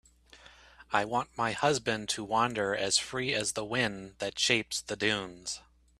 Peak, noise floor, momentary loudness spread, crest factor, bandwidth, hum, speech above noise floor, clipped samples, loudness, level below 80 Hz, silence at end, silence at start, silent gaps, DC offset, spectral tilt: -8 dBFS; -57 dBFS; 10 LU; 24 dB; 14.5 kHz; none; 26 dB; under 0.1%; -30 LUFS; -62 dBFS; 0.4 s; 0.35 s; none; under 0.1%; -2.5 dB/octave